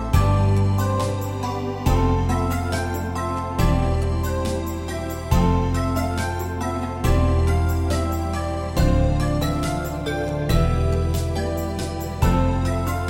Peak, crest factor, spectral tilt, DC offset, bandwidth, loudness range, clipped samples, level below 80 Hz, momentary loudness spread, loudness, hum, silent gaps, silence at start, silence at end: -6 dBFS; 16 dB; -6.5 dB/octave; under 0.1%; 16.5 kHz; 1 LU; under 0.1%; -26 dBFS; 7 LU; -22 LUFS; none; none; 0 s; 0 s